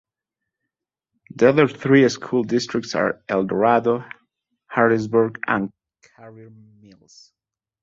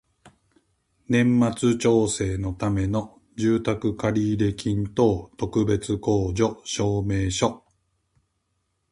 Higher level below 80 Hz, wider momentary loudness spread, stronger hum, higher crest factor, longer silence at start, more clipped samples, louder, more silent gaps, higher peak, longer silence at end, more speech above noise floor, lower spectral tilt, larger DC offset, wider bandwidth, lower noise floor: second, -62 dBFS vs -44 dBFS; about the same, 8 LU vs 6 LU; neither; about the same, 20 dB vs 18 dB; first, 1.4 s vs 0.25 s; neither; first, -19 LUFS vs -24 LUFS; neither; first, -2 dBFS vs -6 dBFS; about the same, 1.35 s vs 1.35 s; first, 68 dB vs 51 dB; about the same, -6 dB/octave vs -6 dB/octave; neither; second, 7.8 kHz vs 11.5 kHz; first, -88 dBFS vs -74 dBFS